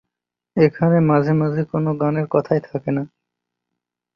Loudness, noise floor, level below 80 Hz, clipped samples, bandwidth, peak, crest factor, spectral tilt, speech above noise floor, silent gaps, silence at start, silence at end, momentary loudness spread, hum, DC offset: -19 LUFS; -84 dBFS; -56 dBFS; under 0.1%; 5.8 kHz; -2 dBFS; 18 dB; -10.5 dB/octave; 67 dB; none; 0.55 s; 1.1 s; 9 LU; 60 Hz at -50 dBFS; under 0.1%